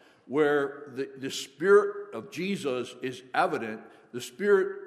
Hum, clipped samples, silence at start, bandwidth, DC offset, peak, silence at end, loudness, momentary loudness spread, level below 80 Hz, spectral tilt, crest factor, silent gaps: none; under 0.1%; 0.3 s; 13.5 kHz; under 0.1%; -10 dBFS; 0 s; -28 LUFS; 17 LU; -82 dBFS; -4.5 dB/octave; 18 dB; none